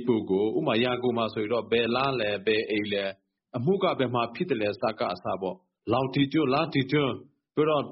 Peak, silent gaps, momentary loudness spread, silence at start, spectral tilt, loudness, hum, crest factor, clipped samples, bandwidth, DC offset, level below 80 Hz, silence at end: -12 dBFS; none; 7 LU; 0 s; -4.5 dB/octave; -27 LUFS; none; 16 dB; under 0.1%; 5.8 kHz; under 0.1%; -64 dBFS; 0 s